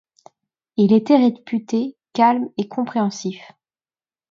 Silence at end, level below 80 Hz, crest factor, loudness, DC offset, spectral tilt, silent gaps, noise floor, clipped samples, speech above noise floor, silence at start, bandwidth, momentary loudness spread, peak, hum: 0.85 s; -72 dBFS; 18 dB; -19 LUFS; under 0.1%; -6.5 dB/octave; none; under -90 dBFS; under 0.1%; over 72 dB; 0.8 s; 7.6 kHz; 14 LU; -2 dBFS; none